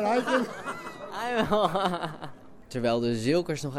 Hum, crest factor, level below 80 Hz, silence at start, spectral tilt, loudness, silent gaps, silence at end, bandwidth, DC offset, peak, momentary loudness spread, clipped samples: none; 18 dB; -54 dBFS; 0 s; -5.5 dB/octave; -28 LUFS; none; 0 s; 16 kHz; under 0.1%; -10 dBFS; 13 LU; under 0.1%